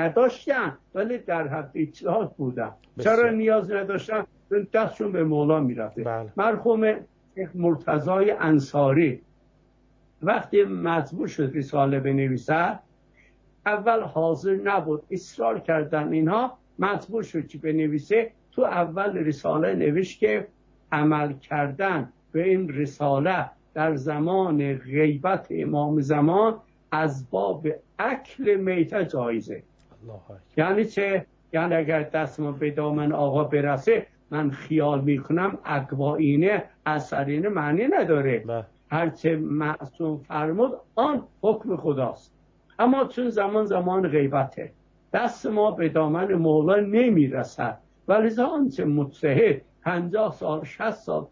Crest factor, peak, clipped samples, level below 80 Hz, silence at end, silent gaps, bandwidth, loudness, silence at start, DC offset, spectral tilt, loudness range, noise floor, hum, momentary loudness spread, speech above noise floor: 16 dB; -8 dBFS; under 0.1%; -62 dBFS; 0.05 s; none; 7.6 kHz; -24 LUFS; 0 s; under 0.1%; -8 dB/octave; 3 LU; -60 dBFS; none; 9 LU; 36 dB